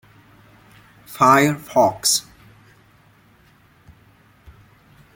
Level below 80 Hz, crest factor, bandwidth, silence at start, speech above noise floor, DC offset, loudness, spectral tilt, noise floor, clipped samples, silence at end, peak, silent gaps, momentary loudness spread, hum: -58 dBFS; 22 dB; 17 kHz; 1.1 s; 37 dB; under 0.1%; -17 LUFS; -3.5 dB/octave; -54 dBFS; under 0.1%; 2.95 s; -2 dBFS; none; 7 LU; none